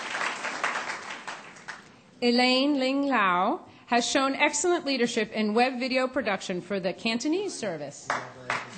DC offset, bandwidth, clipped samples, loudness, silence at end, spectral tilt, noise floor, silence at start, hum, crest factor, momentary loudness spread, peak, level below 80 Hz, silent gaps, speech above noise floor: under 0.1%; 9 kHz; under 0.1%; -26 LUFS; 0 s; -3 dB/octave; -47 dBFS; 0 s; none; 18 dB; 14 LU; -8 dBFS; -70 dBFS; none; 21 dB